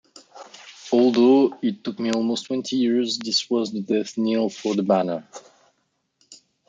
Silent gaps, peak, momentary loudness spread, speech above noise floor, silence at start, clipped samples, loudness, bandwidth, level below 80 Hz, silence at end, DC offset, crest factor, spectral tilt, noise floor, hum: none; -4 dBFS; 11 LU; 51 dB; 0.35 s; under 0.1%; -22 LUFS; 9.2 kHz; -74 dBFS; 0.35 s; under 0.1%; 18 dB; -5 dB/octave; -72 dBFS; none